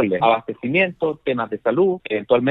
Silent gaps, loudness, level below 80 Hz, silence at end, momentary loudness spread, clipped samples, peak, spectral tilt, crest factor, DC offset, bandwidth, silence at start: none; -20 LUFS; -60 dBFS; 0 s; 6 LU; under 0.1%; -2 dBFS; -9 dB/octave; 16 dB; under 0.1%; 4.1 kHz; 0 s